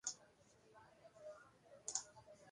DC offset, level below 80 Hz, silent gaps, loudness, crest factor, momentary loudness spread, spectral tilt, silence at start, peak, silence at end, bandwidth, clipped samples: under 0.1%; -86 dBFS; none; -50 LUFS; 30 dB; 21 LU; 0 dB/octave; 0.05 s; -24 dBFS; 0 s; 11.5 kHz; under 0.1%